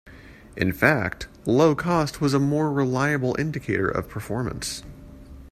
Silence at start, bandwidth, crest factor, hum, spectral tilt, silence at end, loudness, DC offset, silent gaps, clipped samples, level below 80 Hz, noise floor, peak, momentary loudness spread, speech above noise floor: 0.05 s; 14.5 kHz; 22 dB; none; -6 dB/octave; 0 s; -23 LUFS; under 0.1%; none; under 0.1%; -46 dBFS; -46 dBFS; -2 dBFS; 11 LU; 23 dB